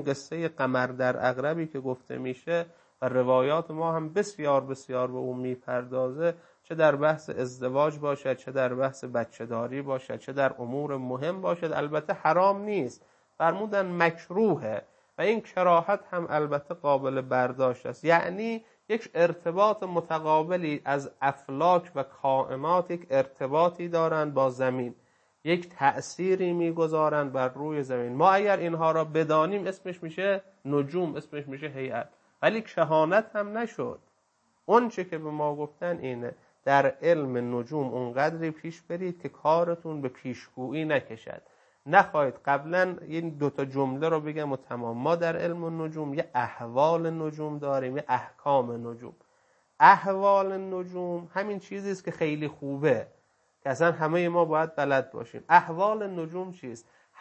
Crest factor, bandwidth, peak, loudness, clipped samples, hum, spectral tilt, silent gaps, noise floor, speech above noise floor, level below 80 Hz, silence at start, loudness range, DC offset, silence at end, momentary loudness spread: 24 dB; 8.6 kHz; -4 dBFS; -28 LUFS; under 0.1%; none; -6.5 dB/octave; none; -71 dBFS; 43 dB; -76 dBFS; 0 s; 4 LU; under 0.1%; 0.4 s; 11 LU